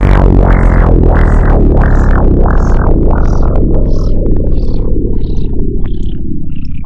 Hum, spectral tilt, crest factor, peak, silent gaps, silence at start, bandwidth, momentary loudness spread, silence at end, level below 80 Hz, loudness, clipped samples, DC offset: none; -9.5 dB/octave; 6 dB; 0 dBFS; none; 0 s; 5.6 kHz; 10 LU; 0 s; -8 dBFS; -12 LUFS; 3%; under 0.1%